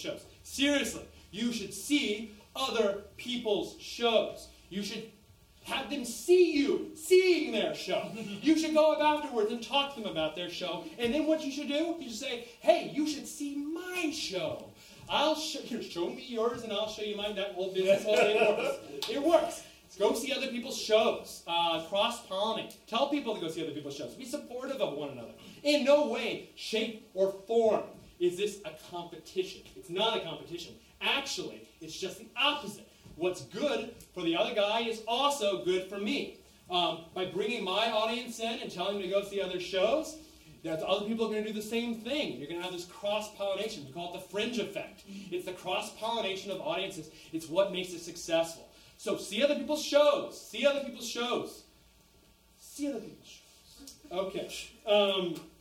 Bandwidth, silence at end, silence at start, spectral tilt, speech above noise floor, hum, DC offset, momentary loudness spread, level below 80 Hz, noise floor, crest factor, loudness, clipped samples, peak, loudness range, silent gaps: 16.5 kHz; 0.1 s; 0 s; -3.5 dB/octave; 31 dB; none; under 0.1%; 15 LU; -66 dBFS; -63 dBFS; 22 dB; -32 LUFS; under 0.1%; -10 dBFS; 6 LU; none